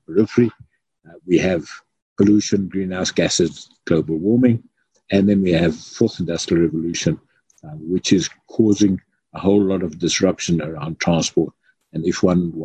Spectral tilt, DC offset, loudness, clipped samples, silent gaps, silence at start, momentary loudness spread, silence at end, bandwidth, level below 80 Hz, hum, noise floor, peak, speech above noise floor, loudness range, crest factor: -5.5 dB/octave; under 0.1%; -19 LUFS; under 0.1%; 2.02-2.16 s; 0.1 s; 11 LU; 0 s; 9.4 kHz; -44 dBFS; none; -50 dBFS; -2 dBFS; 32 dB; 2 LU; 18 dB